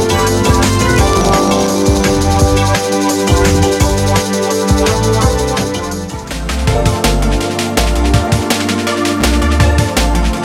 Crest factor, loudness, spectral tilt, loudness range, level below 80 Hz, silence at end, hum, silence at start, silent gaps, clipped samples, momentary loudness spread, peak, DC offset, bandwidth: 12 dB; -13 LUFS; -5 dB/octave; 3 LU; -18 dBFS; 0 s; none; 0 s; none; under 0.1%; 4 LU; 0 dBFS; under 0.1%; 17 kHz